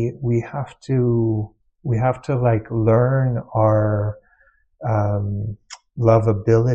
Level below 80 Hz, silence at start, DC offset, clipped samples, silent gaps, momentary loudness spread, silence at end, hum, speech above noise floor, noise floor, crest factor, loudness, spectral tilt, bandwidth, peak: -42 dBFS; 0 s; under 0.1%; under 0.1%; none; 13 LU; 0 s; none; 40 dB; -58 dBFS; 16 dB; -20 LUFS; -9.5 dB/octave; 7.8 kHz; -2 dBFS